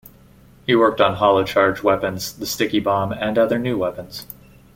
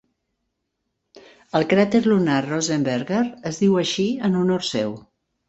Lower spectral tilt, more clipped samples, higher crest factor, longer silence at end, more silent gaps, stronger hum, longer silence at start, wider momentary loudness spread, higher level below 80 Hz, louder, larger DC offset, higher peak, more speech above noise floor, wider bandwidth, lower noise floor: about the same, -5 dB/octave vs -5.5 dB/octave; neither; about the same, 18 dB vs 18 dB; about the same, 0.5 s vs 0.5 s; neither; neither; second, 0.7 s vs 1.15 s; first, 17 LU vs 8 LU; first, -50 dBFS vs -60 dBFS; about the same, -19 LUFS vs -21 LUFS; neither; about the same, -2 dBFS vs -4 dBFS; second, 30 dB vs 57 dB; first, 17 kHz vs 8.2 kHz; second, -48 dBFS vs -77 dBFS